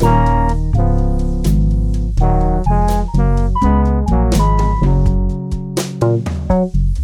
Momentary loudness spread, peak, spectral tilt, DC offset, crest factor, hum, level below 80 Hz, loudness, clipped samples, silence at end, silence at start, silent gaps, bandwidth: 5 LU; 0 dBFS; -7.5 dB/octave; under 0.1%; 12 dB; none; -16 dBFS; -16 LUFS; under 0.1%; 0 s; 0 s; none; 14 kHz